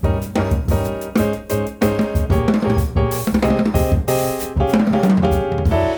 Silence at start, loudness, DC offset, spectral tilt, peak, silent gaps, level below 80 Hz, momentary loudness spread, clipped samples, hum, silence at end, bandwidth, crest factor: 0 s; -18 LUFS; under 0.1%; -7 dB/octave; -4 dBFS; none; -26 dBFS; 5 LU; under 0.1%; none; 0 s; over 20 kHz; 14 dB